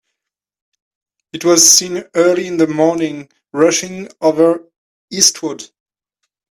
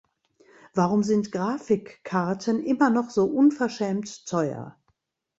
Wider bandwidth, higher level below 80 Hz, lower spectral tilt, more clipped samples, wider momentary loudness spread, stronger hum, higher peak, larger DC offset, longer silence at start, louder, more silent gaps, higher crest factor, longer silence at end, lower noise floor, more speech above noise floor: first, 16 kHz vs 8 kHz; about the same, -62 dBFS vs -66 dBFS; second, -2 dB/octave vs -6.5 dB/octave; neither; first, 19 LU vs 9 LU; neither; first, 0 dBFS vs -6 dBFS; neither; first, 1.35 s vs 0.75 s; first, -13 LUFS vs -25 LUFS; first, 4.78-5.08 s vs none; about the same, 16 dB vs 18 dB; first, 0.85 s vs 0.7 s; first, -81 dBFS vs -72 dBFS; first, 67 dB vs 48 dB